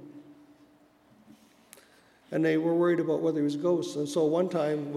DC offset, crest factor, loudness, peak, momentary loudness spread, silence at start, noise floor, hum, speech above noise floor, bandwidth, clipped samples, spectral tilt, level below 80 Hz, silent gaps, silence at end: under 0.1%; 16 dB; -28 LUFS; -14 dBFS; 5 LU; 0 s; -61 dBFS; none; 34 dB; 13 kHz; under 0.1%; -6.5 dB/octave; -82 dBFS; none; 0 s